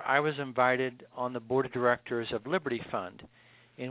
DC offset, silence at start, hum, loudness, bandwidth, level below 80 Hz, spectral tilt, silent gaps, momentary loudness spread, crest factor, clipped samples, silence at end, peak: under 0.1%; 0 s; none; -31 LUFS; 4 kHz; -68 dBFS; -3.5 dB/octave; none; 10 LU; 22 dB; under 0.1%; 0 s; -10 dBFS